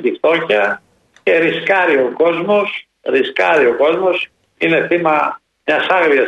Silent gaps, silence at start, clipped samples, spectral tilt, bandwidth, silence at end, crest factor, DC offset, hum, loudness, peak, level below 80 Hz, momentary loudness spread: none; 0 s; under 0.1%; -6 dB/octave; 8.8 kHz; 0 s; 14 dB; under 0.1%; none; -15 LUFS; -2 dBFS; -62 dBFS; 9 LU